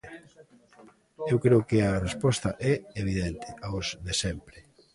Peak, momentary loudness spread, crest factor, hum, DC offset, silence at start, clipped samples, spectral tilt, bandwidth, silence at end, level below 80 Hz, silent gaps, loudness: -10 dBFS; 15 LU; 20 dB; none; under 0.1%; 0.05 s; under 0.1%; -5.5 dB/octave; 11.5 kHz; 0.35 s; -46 dBFS; none; -28 LUFS